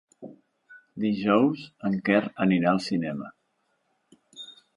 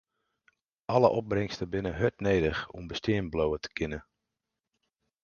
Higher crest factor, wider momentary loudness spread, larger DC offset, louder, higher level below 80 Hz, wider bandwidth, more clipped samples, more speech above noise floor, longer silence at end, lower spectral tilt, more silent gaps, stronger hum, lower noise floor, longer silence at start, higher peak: about the same, 20 dB vs 24 dB; first, 22 LU vs 11 LU; neither; first, -25 LUFS vs -30 LUFS; second, -68 dBFS vs -50 dBFS; first, 11 kHz vs 7 kHz; neither; second, 49 dB vs 58 dB; second, 0.25 s vs 1.2 s; about the same, -7 dB/octave vs -6.5 dB/octave; neither; neither; second, -73 dBFS vs -87 dBFS; second, 0.2 s vs 0.9 s; about the same, -8 dBFS vs -8 dBFS